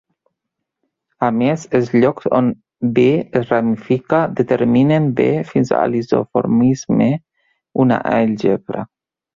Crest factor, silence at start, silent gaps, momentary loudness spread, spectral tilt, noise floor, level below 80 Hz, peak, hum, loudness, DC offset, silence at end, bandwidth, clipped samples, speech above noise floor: 16 dB; 1.2 s; none; 7 LU; -8 dB/octave; -79 dBFS; -54 dBFS; -2 dBFS; none; -16 LUFS; under 0.1%; 0.5 s; 7.6 kHz; under 0.1%; 64 dB